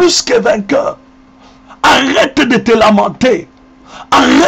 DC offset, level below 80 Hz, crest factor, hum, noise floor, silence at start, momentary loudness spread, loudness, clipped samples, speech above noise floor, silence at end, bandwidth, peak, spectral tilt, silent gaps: under 0.1%; -42 dBFS; 10 dB; none; -41 dBFS; 0 s; 6 LU; -10 LUFS; under 0.1%; 31 dB; 0 s; 16 kHz; -2 dBFS; -3.5 dB/octave; none